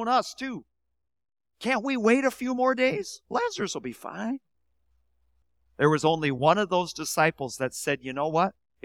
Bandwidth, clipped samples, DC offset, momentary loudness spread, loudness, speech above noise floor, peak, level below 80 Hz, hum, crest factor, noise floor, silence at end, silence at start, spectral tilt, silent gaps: 17 kHz; under 0.1%; under 0.1%; 12 LU; -26 LUFS; 48 dB; -6 dBFS; -66 dBFS; none; 22 dB; -74 dBFS; 0.35 s; 0 s; -4.5 dB/octave; none